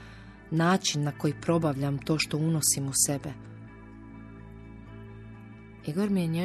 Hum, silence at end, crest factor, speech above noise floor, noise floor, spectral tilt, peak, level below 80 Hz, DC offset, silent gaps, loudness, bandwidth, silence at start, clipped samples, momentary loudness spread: none; 0 s; 20 dB; 20 dB; -47 dBFS; -4 dB/octave; -10 dBFS; -54 dBFS; under 0.1%; none; -27 LUFS; 13.5 kHz; 0 s; under 0.1%; 23 LU